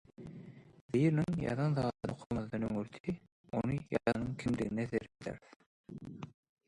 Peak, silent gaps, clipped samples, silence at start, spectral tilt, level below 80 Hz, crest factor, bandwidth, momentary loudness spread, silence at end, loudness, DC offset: -16 dBFS; 0.81-0.89 s, 2.26-2.30 s, 3.00-3.04 s, 3.32-3.44 s, 5.56-5.60 s, 5.66-5.84 s; under 0.1%; 0.2 s; -8 dB/octave; -60 dBFS; 22 dB; 11 kHz; 19 LU; 0.4 s; -36 LUFS; under 0.1%